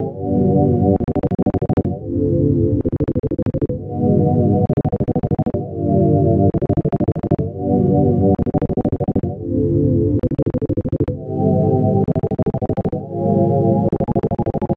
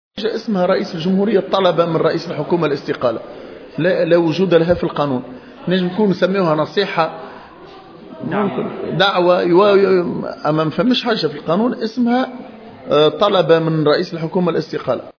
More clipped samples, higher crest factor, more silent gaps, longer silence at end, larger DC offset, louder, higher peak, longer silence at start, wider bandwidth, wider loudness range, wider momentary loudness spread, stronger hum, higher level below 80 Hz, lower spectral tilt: neither; about the same, 16 dB vs 16 dB; neither; about the same, 0 s vs 0.1 s; first, 0.1% vs under 0.1%; about the same, -18 LUFS vs -16 LUFS; about the same, 0 dBFS vs 0 dBFS; second, 0 s vs 0.15 s; second, 3.4 kHz vs 5.4 kHz; about the same, 2 LU vs 4 LU; second, 6 LU vs 10 LU; neither; first, -36 dBFS vs -54 dBFS; first, -13 dB/octave vs -7.5 dB/octave